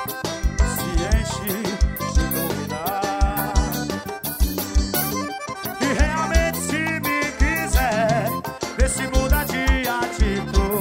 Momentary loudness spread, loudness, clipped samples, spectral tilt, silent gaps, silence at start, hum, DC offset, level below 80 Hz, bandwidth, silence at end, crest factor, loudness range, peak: 6 LU; -22 LUFS; under 0.1%; -4.5 dB/octave; none; 0 s; none; under 0.1%; -24 dBFS; 16.5 kHz; 0 s; 18 dB; 2 LU; -4 dBFS